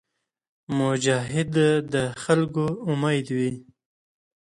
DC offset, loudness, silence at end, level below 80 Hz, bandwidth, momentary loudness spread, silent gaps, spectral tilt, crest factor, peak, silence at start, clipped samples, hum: under 0.1%; -24 LUFS; 0.9 s; -60 dBFS; 11.5 kHz; 6 LU; none; -5.5 dB/octave; 20 dB; -6 dBFS; 0.7 s; under 0.1%; none